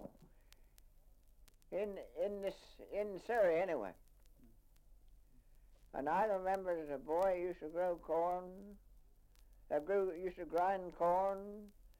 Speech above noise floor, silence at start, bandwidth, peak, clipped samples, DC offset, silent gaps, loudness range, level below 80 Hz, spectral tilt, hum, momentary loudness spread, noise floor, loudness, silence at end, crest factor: 26 dB; 0 s; 16.5 kHz; -24 dBFS; under 0.1%; under 0.1%; none; 4 LU; -64 dBFS; -6.5 dB/octave; none; 15 LU; -65 dBFS; -39 LUFS; 0.1 s; 16 dB